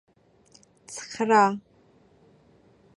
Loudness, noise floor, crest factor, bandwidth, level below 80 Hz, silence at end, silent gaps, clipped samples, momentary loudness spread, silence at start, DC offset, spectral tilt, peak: -23 LUFS; -59 dBFS; 24 dB; 11.5 kHz; -72 dBFS; 1.35 s; none; under 0.1%; 19 LU; 0.9 s; under 0.1%; -4.5 dB/octave; -6 dBFS